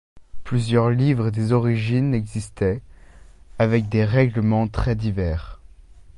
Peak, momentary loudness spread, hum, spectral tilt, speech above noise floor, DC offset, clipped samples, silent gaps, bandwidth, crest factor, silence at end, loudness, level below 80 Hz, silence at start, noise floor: -4 dBFS; 7 LU; none; -8 dB/octave; 25 dB; under 0.1%; under 0.1%; none; 11 kHz; 18 dB; 0.15 s; -21 LUFS; -36 dBFS; 0.15 s; -45 dBFS